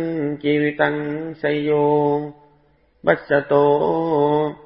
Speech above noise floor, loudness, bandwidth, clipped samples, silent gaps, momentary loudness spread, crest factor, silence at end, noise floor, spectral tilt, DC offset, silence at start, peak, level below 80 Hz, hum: 40 dB; -19 LUFS; 5.4 kHz; under 0.1%; none; 8 LU; 18 dB; 0.1 s; -58 dBFS; -11.5 dB/octave; under 0.1%; 0 s; 0 dBFS; -58 dBFS; none